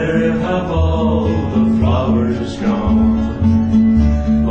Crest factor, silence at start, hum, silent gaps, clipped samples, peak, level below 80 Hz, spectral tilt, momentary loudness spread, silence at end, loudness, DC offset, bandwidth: 12 dB; 0 s; none; none; under 0.1%; -2 dBFS; -24 dBFS; -8.5 dB/octave; 5 LU; 0 s; -15 LUFS; under 0.1%; 7.4 kHz